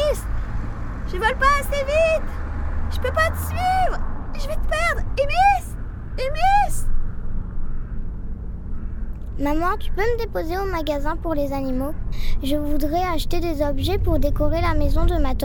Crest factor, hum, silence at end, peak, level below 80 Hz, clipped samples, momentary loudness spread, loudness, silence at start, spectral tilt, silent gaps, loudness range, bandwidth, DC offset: 14 dB; none; 0 s; -6 dBFS; -24 dBFS; under 0.1%; 15 LU; -23 LUFS; 0 s; -5.5 dB/octave; none; 5 LU; 17.5 kHz; under 0.1%